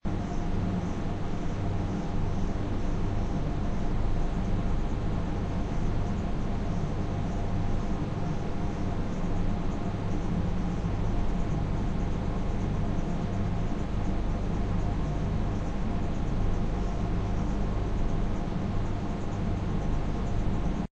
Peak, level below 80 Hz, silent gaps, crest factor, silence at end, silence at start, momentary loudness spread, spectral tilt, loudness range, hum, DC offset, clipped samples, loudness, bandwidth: -16 dBFS; -30 dBFS; none; 12 dB; 0.05 s; 0.05 s; 2 LU; -8 dB/octave; 1 LU; none; under 0.1%; under 0.1%; -32 LUFS; 7.8 kHz